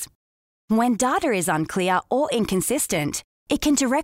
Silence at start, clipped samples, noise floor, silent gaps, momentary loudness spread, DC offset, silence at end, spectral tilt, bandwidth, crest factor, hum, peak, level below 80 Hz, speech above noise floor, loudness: 0 s; under 0.1%; under -90 dBFS; 0.15-0.68 s, 3.24-3.46 s; 7 LU; under 0.1%; 0 s; -4 dB/octave; 16 kHz; 14 dB; none; -8 dBFS; -50 dBFS; over 68 dB; -22 LUFS